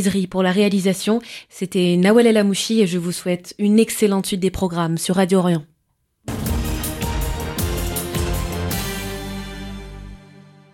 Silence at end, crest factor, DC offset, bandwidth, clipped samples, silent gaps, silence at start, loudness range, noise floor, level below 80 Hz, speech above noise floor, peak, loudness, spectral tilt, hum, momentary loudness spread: 0.35 s; 16 dB; under 0.1%; 17 kHz; under 0.1%; none; 0 s; 7 LU; -68 dBFS; -34 dBFS; 51 dB; -2 dBFS; -20 LUFS; -5.5 dB/octave; none; 15 LU